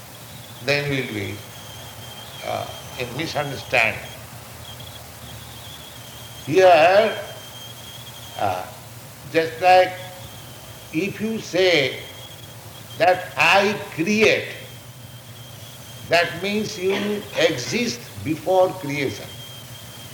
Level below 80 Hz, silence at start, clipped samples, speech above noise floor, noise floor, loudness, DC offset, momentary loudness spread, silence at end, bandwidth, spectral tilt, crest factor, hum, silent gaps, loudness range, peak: -56 dBFS; 0 s; under 0.1%; 20 dB; -40 dBFS; -20 LUFS; under 0.1%; 22 LU; 0 s; over 20 kHz; -4 dB/octave; 20 dB; none; none; 6 LU; -2 dBFS